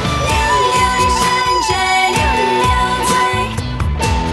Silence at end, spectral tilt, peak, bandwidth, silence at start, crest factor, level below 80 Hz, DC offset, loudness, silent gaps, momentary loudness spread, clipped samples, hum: 0 s; -3.5 dB/octave; -2 dBFS; 16 kHz; 0 s; 12 dB; -26 dBFS; under 0.1%; -14 LUFS; none; 5 LU; under 0.1%; none